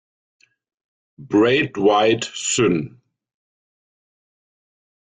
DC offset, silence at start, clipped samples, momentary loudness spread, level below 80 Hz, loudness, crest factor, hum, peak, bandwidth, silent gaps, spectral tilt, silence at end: under 0.1%; 1.2 s; under 0.1%; 6 LU; -60 dBFS; -18 LUFS; 18 dB; none; -6 dBFS; 9.6 kHz; none; -4 dB/octave; 2.15 s